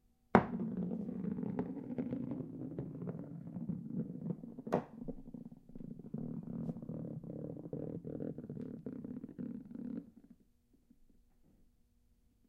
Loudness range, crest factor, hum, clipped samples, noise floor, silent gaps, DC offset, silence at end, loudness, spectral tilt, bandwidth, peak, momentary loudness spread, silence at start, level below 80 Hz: 7 LU; 36 dB; none; under 0.1%; -72 dBFS; none; under 0.1%; 0.8 s; -42 LUFS; -9.5 dB/octave; 7 kHz; -6 dBFS; 9 LU; 0.35 s; -64 dBFS